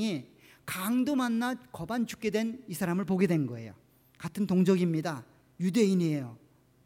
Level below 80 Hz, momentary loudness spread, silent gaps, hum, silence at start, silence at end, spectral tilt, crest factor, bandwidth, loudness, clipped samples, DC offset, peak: -68 dBFS; 15 LU; none; none; 0 s; 0.5 s; -6.5 dB/octave; 16 dB; 16.5 kHz; -30 LUFS; under 0.1%; under 0.1%; -14 dBFS